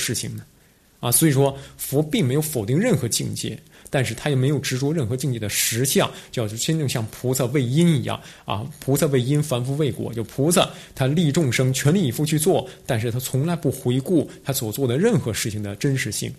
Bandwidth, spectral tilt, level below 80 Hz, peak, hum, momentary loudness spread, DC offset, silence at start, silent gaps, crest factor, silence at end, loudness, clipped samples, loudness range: 14 kHz; -5 dB/octave; -52 dBFS; -4 dBFS; none; 9 LU; under 0.1%; 0 s; none; 18 dB; 0 s; -22 LUFS; under 0.1%; 2 LU